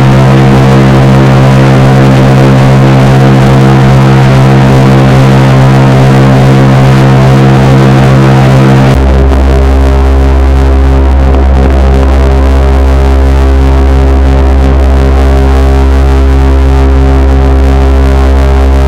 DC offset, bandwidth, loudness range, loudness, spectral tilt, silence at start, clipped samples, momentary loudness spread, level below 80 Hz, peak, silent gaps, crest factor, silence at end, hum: 4%; 10.5 kHz; 3 LU; -4 LUFS; -7.5 dB/octave; 0 s; 10%; 3 LU; -6 dBFS; 0 dBFS; none; 2 dB; 0 s; none